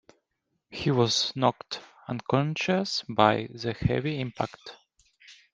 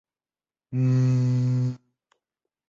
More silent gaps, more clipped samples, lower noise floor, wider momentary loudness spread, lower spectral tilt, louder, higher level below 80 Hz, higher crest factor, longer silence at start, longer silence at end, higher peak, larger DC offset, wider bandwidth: neither; neither; second, -79 dBFS vs under -90 dBFS; first, 15 LU vs 11 LU; second, -5 dB/octave vs -9 dB/octave; second, -27 LUFS vs -24 LUFS; first, -56 dBFS vs -62 dBFS; first, 24 dB vs 12 dB; about the same, 0.7 s vs 0.7 s; second, 0.2 s vs 0.9 s; first, -4 dBFS vs -14 dBFS; neither; first, 9.8 kHz vs 7.2 kHz